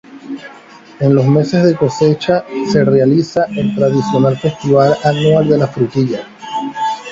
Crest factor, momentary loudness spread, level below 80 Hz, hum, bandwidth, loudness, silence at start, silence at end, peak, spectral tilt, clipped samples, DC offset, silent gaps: 14 dB; 11 LU; -48 dBFS; none; 7.8 kHz; -13 LUFS; 0.1 s; 0 s; 0 dBFS; -7.5 dB/octave; under 0.1%; under 0.1%; none